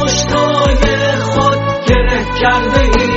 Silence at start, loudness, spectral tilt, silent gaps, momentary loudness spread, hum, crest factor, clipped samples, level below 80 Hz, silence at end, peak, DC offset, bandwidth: 0 s; -12 LUFS; -4.5 dB/octave; none; 2 LU; none; 12 dB; under 0.1%; -18 dBFS; 0 s; 0 dBFS; under 0.1%; 8 kHz